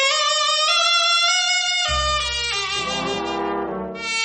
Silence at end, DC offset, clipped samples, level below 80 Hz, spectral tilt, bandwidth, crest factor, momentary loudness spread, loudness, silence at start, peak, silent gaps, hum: 0 s; under 0.1%; under 0.1%; -40 dBFS; -1 dB/octave; 8.8 kHz; 16 dB; 9 LU; -18 LUFS; 0 s; -6 dBFS; none; none